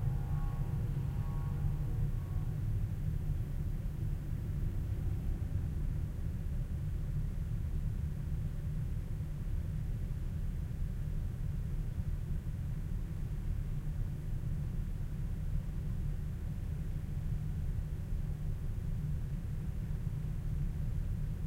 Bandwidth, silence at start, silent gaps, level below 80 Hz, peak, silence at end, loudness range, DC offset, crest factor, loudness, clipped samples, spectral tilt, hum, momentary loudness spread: 15.5 kHz; 0 s; none; -38 dBFS; -22 dBFS; 0 s; 2 LU; under 0.1%; 14 dB; -39 LUFS; under 0.1%; -8.5 dB/octave; none; 3 LU